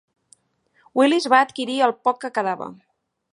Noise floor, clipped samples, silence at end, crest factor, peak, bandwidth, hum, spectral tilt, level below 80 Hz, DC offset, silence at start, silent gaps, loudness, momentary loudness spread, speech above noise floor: -64 dBFS; under 0.1%; 0.6 s; 20 dB; -2 dBFS; 11.5 kHz; none; -3.5 dB/octave; -76 dBFS; under 0.1%; 0.95 s; none; -20 LUFS; 11 LU; 44 dB